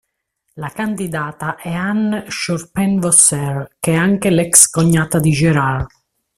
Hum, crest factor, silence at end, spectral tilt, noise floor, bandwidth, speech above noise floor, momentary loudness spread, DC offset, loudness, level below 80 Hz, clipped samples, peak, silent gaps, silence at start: none; 16 dB; 0.5 s; -4 dB/octave; -69 dBFS; 16 kHz; 53 dB; 14 LU; under 0.1%; -14 LUFS; -44 dBFS; under 0.1%; 0 dBFS; none; 0.55 s